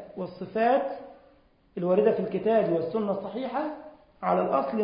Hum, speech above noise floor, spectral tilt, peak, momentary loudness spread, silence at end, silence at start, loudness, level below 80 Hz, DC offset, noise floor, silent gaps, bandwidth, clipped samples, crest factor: none; 34 dB; -11 dB/octave; -10 dBFS; 13 LU; 0 s; 0 s; -27 LUFS; -66 dBFS; under 0.1%; -60 dBFS; none; 5.2 kHz; under 0.1%; 16 dB